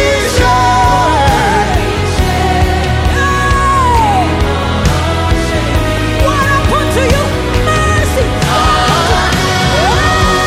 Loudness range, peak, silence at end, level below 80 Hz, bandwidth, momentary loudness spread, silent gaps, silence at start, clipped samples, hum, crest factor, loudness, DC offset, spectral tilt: 1 LU; 0 dBFS; 0 s; -18 dBFS; 16 kHz; 4 LU; none; 0 s; under 0.1%; none; 10 dB; -11 LUFS; 0.3%; -4.5 dB/octave